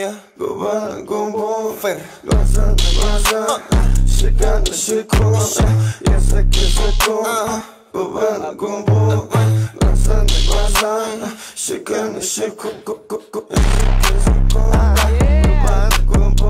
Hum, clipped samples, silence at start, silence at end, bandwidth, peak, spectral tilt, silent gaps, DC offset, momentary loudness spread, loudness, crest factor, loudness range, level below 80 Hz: none; under 0.1%; 0 s; 0 s; 15.5 kHz; -2 dBFS; -4.5 dB/octave; none; under 0.1%; 9 LU; -17 LUFS; 12 dB; 3 LU; -16 dBFS